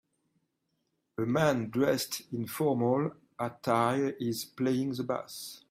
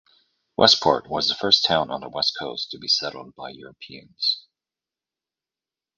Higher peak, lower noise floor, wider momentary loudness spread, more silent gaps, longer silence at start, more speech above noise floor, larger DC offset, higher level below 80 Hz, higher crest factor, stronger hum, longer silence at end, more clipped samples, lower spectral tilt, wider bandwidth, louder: second, -12 dBFS vs 0 dBFS; second, -79 dBFS vs under -90 dBFS; second, 10 LU vs 22 LU; neither; first, 1.2 s vs 0.6 s; second, 49 dB vs over 67 dB; neither; second, -70 dBFS vs -60 dBFS; second, 18 dB vs 24 dB; neither; second, 0.1 s vs 1.6 s; neither; first, -5.5 dB/octave vs -2.5 dB/octave; first, 16 kHz vs 9.6 kHz; second, -31 LUFS vs -20 LUFS